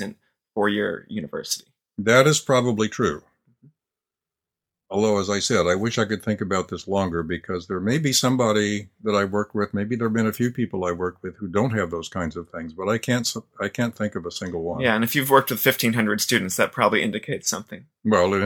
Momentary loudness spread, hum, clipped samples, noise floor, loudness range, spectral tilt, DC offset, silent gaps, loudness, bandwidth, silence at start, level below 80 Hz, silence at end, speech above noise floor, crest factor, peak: 11 LU; none; under 0.1%; -88 dBFS; 5 LU; -4.5 dB/octave; under 0.1%; none; -23 LUFS; 19 kHz; 0 s; -56 dBFS; 0 s; 66 dB; 22 dB; 0 dBFS